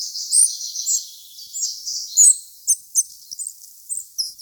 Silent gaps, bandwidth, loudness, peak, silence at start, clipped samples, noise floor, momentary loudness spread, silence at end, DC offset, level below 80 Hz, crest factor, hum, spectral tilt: none; over 20 kHz; -17 LUFS; -4 dBFS; 0 s; under 0.1%; -40 dBFS; 18 LU; 0.05 s; under 0.1%; -76 dBFS; 18 dB; none; 6.5 dB/octave